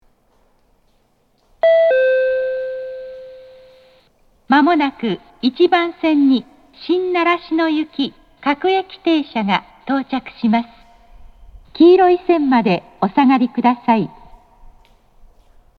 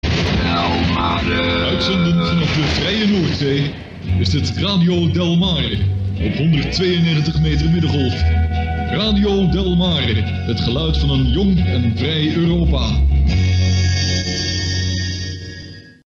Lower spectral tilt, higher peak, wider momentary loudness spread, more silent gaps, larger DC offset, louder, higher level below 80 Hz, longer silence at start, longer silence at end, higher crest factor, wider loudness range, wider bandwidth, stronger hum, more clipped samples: first, -7.5 dB/octave vs -6 dB/octave; first, 0 dBFS vs -6 dBFS; first, 12 LU vs 5 LU; neither; neither; about the same, -16 LUFS vs -17 LUFS; second, -52 dBFS vs -24 dBFS; first, 1.65 s vs 0.05 s; first, 1.7 s vs 0.35 s; first, 18 dB vs 10 dB; first, 5 LU vs 1 LU; second, 6.4 kHz vs 7.6 kHz; neither; neither